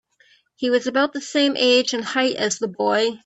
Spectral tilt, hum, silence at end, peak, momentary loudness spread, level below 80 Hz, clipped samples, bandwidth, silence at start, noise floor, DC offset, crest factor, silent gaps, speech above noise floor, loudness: -2.5 dB/octave; none; 0.1 s; -4 dBFS; 6 LU; -68 dBFS; under 0.1%; 8.4 kHz; 0.6 s; -58 dBFS; under 0.1%; 16 dB; none; 38 dB; -20 LUFS